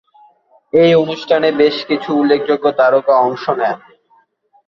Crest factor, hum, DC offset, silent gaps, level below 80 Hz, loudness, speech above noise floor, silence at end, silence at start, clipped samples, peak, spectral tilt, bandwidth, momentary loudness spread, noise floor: 14 dB; none; under 0.1%; none; -60 dBFS; -14 LUFS; 42 dB; 0.9 s; 0.75 s; under 0.1%; -2 dBFS; -7 dB/octave; 6.8 kHz; 7 LU; -55 dBFS